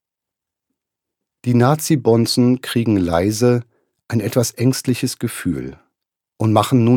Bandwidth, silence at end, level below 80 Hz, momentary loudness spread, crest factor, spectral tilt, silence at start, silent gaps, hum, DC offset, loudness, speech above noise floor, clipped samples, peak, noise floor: 18 kHz; 0 s; -48 dBFS; 9 LU; 16 dB; -6 dB/octave; 1.45 s; none; none; under 0.1%; -18 LUFS; 69 dB; under 0.1%; -2 dBFS; -85 dBFS